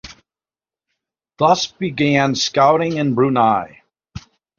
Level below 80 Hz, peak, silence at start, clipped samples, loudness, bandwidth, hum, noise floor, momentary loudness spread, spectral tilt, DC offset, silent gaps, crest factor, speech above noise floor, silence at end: -54 dBFS; 0 dBFS; 0.05 s; under 0.1%; -16 LUFS; 7.4 kHz; none; under -90 dBFS; 6 LU; -5 dB/octave; under 0.1%; none; 18 dB; over 74 dB; 0.4 s